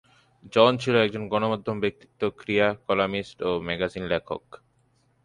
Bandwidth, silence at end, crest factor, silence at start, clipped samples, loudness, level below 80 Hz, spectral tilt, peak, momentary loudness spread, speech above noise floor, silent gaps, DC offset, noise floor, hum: 10.5 kHz; 0.85 s; 24 dB; 0.45 s; under 0.1%; -25 LUFS; -56 dBFS; -6 dB/octave; -2 dBFS; 10 LU; 41 dB; none; under 0.1%; -66 dBFS; none